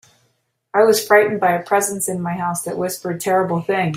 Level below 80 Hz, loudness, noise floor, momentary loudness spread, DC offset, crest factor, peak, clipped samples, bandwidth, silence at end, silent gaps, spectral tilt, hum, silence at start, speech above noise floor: -62 dBFS; -18 LUFS; -66 dBFS; 10 LU; under 0.1%; 16 dB; -2 dBFS; under 0.1%; 16 kHz; 0 s; none; -4 dB/octave; none; 0.75 s; 49 dB